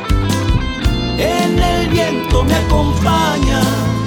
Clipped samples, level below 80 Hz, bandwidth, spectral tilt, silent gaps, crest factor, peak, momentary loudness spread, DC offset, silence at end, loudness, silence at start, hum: under 0.1%; -20 dBFS; 20 kHz; -5.5 dB/octave; none; 14 dB; 0 dBFS; 3 LU; under 0.1%; 0 s; -15 LUFS; 0 s; none